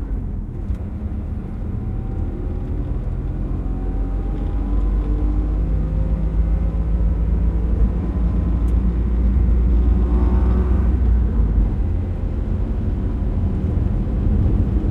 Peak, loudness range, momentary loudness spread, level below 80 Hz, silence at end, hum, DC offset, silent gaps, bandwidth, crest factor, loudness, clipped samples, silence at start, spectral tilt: -6 dBFS; 7 LU; 9 LU; -20 dBFS; 0 s; none; under 0.1%; none; 3.1 kHz; 12 dB; -22 LUFS; under 0.1%; 0 s; -10.5 dB/octave